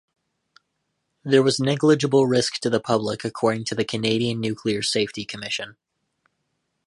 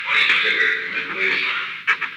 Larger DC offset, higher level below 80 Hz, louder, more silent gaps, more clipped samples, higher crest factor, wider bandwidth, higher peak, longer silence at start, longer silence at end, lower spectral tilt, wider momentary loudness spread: neither; first, -62 dBFS vs -76 dBFS; second, -22 LUFS vs -18 LUFS; neither; neither; first, 20 dB vs 14 dB; second, 11.5 kHz vs 15 kHz; about the same, -4 dBFS vs -6 dBFS; first, 1.25 s vs 0 s; first, 1.15 s vs 0 s; first, -5 dB/octave vs -1.5 dB/octave; first, 10 LU vs 7 LU